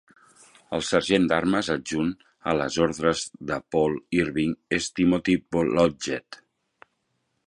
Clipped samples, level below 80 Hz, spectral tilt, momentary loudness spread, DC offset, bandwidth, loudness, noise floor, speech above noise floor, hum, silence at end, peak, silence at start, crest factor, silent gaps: under 0.1%; -52 dBFS; -5 dB/octave; 9 LU; under 0.1%; 11.5 kHz; -25 LUFS; -75 dBFS; 50 dB; none; 1.1 s; -4 dBFS; 0.7 s; 20 dB; none